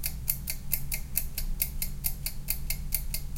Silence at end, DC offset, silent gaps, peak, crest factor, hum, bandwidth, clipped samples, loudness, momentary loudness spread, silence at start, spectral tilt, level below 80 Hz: 0 s; under 0.1%; none; -6 dBFS; 26 dB; none; 17 kHz; under 0.1%; -32 LUFS; 3 LU; 0 s; -2 dB/octave; -36 dBFS